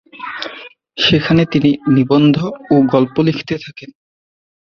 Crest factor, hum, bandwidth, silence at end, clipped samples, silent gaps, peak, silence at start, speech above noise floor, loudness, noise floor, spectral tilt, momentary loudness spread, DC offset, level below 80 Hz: 14 dB; none; 6.6 kHz; 0.75 s; under 0.1%; none; 0 dBFS; 0.15 s; 23 dB; -14 LUFS; -36 dBFS; -7.5 dB/octave; 16 LU; under 0.1%; -48 dBFS